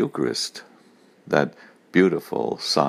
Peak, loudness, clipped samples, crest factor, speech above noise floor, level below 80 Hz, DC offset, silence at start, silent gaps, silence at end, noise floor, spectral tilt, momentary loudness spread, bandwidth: -2 dBFS; -23 LUFS; under 0.1%; 22 dB; 32 dB; -68 dBFS; under 0.1%; 0 s; none; 0 s; -55 dBFS; -4.5 dB/octave; 10 LU; 15.5 kHz